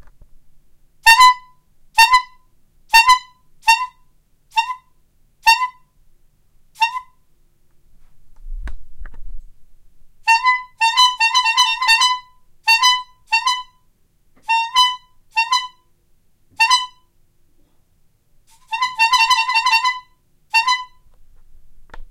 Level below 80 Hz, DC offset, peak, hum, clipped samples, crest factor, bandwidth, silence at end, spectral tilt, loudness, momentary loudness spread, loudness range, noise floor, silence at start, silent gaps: -42 dBFS; under 0.1%; 0 dBFS; none; under 0.1%; 20 dB; 16.5 kHz; 0.05 s; 3.5 dB/octave; -15 LUFS; 17 LU; 9 LU; -57 dBFS; 0.05 s; none